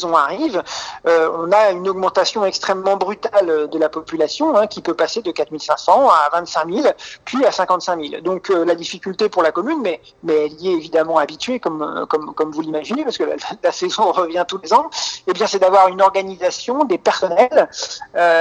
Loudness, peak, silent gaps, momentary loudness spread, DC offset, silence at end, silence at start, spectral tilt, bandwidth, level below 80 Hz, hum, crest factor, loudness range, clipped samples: -17 LUFS; 0 dBFS; none; 9 LU; under 0.1%; 0 s; 0 s; -3.5 dB/octave; 9 kHz; -62 dBFS; none; 16 dB; 4 LU; under 0.1%